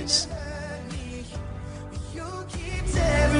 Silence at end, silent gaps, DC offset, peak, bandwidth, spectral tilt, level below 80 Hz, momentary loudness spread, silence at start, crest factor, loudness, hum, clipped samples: 0 s; none; under 0.1%; -8 dBFS; 10.5 kHz; -4 dB/octave; -32 dBFS; 13 LU; 0 s; 18 dB; -30 LUFS; none; under 0.1%